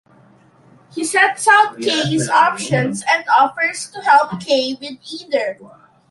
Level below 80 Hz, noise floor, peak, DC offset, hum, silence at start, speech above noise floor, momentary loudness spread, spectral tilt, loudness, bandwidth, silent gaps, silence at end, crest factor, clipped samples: -62 dBFS; -50 dBFS; -2 dBFS; under 0.1%; none; 0.95 s; 33 dB; 14 LU; -3.5 dB/octave; -16 LUFS; 11.5 kHz; none; 0.45 s; 16 dB; under 0.1%